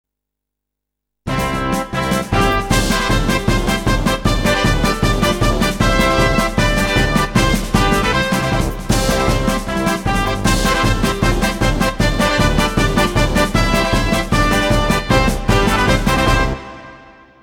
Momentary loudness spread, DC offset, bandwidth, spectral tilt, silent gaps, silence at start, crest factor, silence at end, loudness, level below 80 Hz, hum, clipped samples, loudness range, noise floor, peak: 4 LU; under 0.1%; 17.5 kHz; -4.5 dB/octave; none; 1.25 s; 16 dB; 0.4 s; -16 LUFS; -22 dBFS; none; under 0.1%; 2 LU; -81 dBFS; 0 dBFS